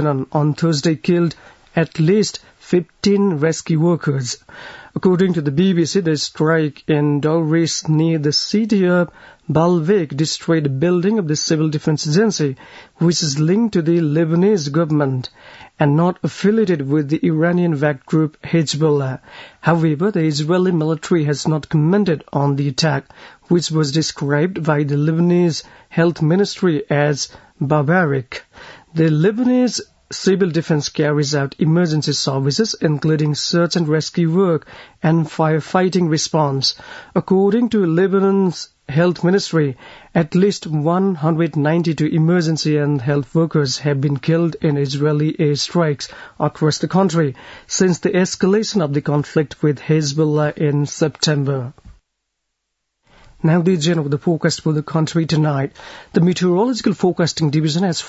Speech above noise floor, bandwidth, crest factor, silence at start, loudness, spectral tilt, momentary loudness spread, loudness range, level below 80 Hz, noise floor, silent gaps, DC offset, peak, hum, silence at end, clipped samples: 58 dB; 8 kHz; 16 dB; 0 s; -17 LUFS; -6 dB/octave; 6 LU; 2 LU; -56 dBFS; -75 dBFS; none; under 0.1%; 0 dBFS; none; 0 s; under 0.1%